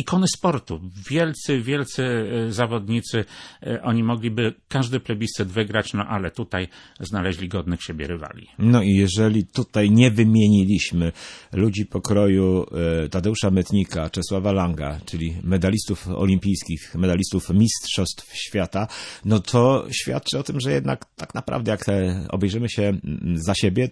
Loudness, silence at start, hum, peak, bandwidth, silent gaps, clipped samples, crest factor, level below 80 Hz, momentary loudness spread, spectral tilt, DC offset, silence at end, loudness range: -22 LUFS; 0 s; none; -2 dBFS; 11 kHz; none; under 0.1%; 18 dB; -44 dBFS; 11 LU; -6 dB/octave; under 0.1%; 0 s; 6 LU